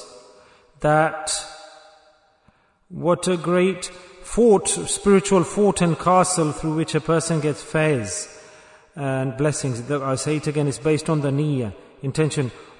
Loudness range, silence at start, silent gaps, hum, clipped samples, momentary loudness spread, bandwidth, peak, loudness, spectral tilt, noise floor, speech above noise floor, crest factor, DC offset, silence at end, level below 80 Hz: 6 LU; 0 s; none; none; under 0.1%; 12 LU; 11 kHz; -4 dBFS; -21 LUFS; -5 dB/octave; -60 dBFS; 39 dB; 18 dB; under 0.1%; 0.15 s; -48 dBFS